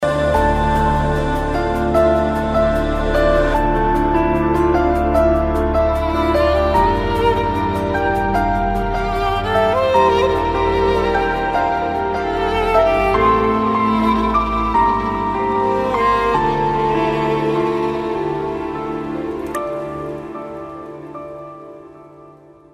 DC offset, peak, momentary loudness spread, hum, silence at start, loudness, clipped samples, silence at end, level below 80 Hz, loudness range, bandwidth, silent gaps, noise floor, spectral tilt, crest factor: under 0.1%; -2 dBFS; 9 LU; none; 0 s; -17 LUFS; under 0.1%; 0.45 s; -28 dBFS; 7 LU; 15.5 kHz; none; -43 dBFS; -7 dB/octave; 14 dB